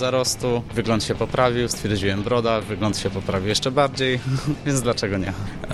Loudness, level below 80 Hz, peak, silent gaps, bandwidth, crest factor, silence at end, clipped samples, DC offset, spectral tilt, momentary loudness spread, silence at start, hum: -22 LUFS; -40 dBFS; -4 dBFS; none; 14.5 kHz; 18 dB; 0 s; under 0.1%; under 0.1%; -4.5 dB/octave; 5 LU; 0 s; none